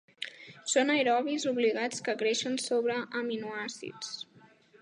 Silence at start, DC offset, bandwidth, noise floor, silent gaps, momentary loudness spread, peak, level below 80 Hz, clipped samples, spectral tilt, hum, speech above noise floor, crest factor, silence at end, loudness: 0.2 s; under 0.1%; 11.5 kHz; -59 dBFS; none; 15 LU; -14 dBFS; -84 dBFS; under 0.1%; -2.5 dB/octave; none; 29 dB; 18 dB; 0.4 s; -30 LUFS